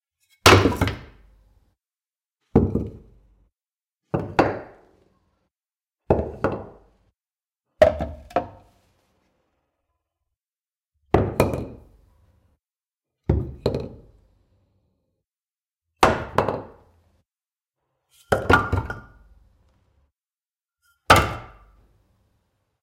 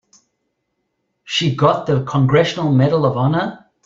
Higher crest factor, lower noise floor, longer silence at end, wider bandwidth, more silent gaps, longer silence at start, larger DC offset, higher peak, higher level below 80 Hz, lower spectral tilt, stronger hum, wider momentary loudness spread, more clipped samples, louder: first, 24 dB vs 16 dB; first, under -90 dBFS vs -72 dBFS; first, 1.35 s vs 0.3 s; first, 16 kHz vs 7.6 kHz; neither; second, 0.45 s vs 1.25 s; neither; about the same, -2 dBFS vs -2 dBFS; first, -40 dBFS vs -52 dBFS; second, -5 dB/octave vs -6.5 dB/octave; neither; first, 19 LU vs 6 LU; neither; second, -22 LUFS vs -16 LUFS